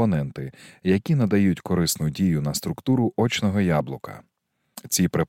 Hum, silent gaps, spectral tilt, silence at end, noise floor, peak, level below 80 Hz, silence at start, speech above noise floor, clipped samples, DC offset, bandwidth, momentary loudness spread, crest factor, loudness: none; none; -5.5 dB/octave; 0.05 s; -48 dBFS; -8 dBFS; -50 dBFS; 0 s; 25 dB; under 0.1%; under 0.1%; 17 kHz; 14 LU; 16 dB; -23 LUFS